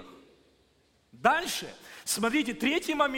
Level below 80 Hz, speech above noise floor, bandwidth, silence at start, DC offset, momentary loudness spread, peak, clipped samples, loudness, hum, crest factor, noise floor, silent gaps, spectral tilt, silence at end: -62 dBFS; 38 dB; 17 kHz; 0 s; under 0.1%; 10 LU; -8 dBFS; under 0.1%; -28 LUFS; none; 22 dB; -67 dBFS; none; -2.5 dB/octave; 0 s